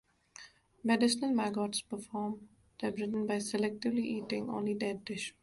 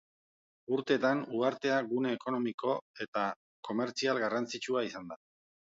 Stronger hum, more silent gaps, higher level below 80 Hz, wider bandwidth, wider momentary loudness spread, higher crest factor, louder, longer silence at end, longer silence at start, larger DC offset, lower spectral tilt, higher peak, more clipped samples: neither; second, none vs 2.54-2.58 s, 2.82-2.94 s, 3.08-3.13 s, 3.36-3.63 s; first, -72 dBFS vs -80 dBFS; first, 12 kHz vs 7.8 kHz; about the same, 11 LU vs 11 LU; about the same, 18 dB vs 18 dB; about the same, -34 LUFS vs -33 LUFS; second, 0.1 s vs 0.6 s; second, 0.4 s vs 0.7 s; neither; about the same, -4.5 dB/octave vs -4.5 dB/octave; about the same, -16 dBFS vs -16 dBFS; neither